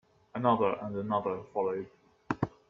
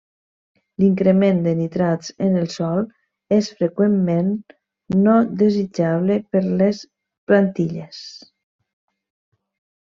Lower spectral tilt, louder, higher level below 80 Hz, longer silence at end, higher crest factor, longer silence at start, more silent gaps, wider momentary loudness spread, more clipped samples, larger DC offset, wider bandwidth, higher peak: about the same, -8.5 dB/octave vs -8 dB/octave; second, -32 LUFS vs -19 LUFS; about the same, -64 dBFS vs -60 dBFS; second, 0.2 s vs 1.75 s; about the same, 20 dB vs 16 dB; second, 0.35 s vs 0.8 s; second, none vs 7.18-7.27 s; second, 12 LU vs 15 LU; neither; neither; about the same, 7.4 kHz vs 7.4 kHz; second, -12 dBFS vs -4 dBFS